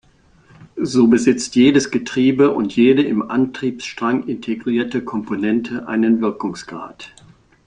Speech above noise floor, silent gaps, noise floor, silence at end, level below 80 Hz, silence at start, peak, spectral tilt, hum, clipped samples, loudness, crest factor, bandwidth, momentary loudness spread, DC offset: 35 dB; none; -52 dBFS; 0.6 s; -56 dBFS; 0.6 s; -2 dBFS; -5.5 dB/octave; none; under 0.1%; -17 LUFS; 16 dB; 9.8 kHz; 13 LU; under 0.1%